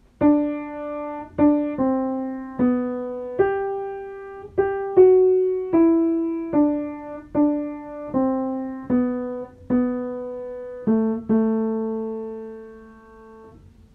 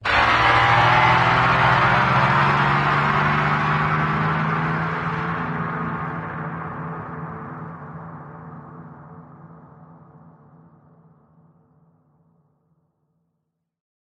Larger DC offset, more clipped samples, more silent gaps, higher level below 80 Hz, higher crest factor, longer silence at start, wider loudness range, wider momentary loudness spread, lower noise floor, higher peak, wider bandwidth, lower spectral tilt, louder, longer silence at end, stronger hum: neither; neither; neither; second, -54 dBFS vs -44 dBFS; about the same, 18 dB vs 18 dB; first, 0.2 s vs 0 s; second, 6 LU vs 22 LU; second, 14 LU vs 22 LU; second, -47 dBFS vs -77 dBFS; about the same, -4 dBFS vs -4 dBFS; second, 3.4 kHz vs 9.8 kHz; first, -10.5 dB/octave vs -6 dB/octave; second, -22 LUFS vs -19 LUFS; second, 0.45 s vs 4.35 s; neither